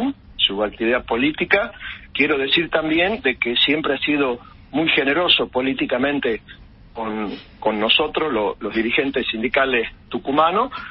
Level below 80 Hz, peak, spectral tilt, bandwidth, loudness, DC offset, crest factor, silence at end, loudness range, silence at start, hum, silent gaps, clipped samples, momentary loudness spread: -48 dBFS; 0 dBFS; -9 dB/octave; 5.8 kHz; -19 LUFS; under 0.1%; 20 dB; 0 s; 3 LU; 0 s; none; none; under 0.1%; 11 LU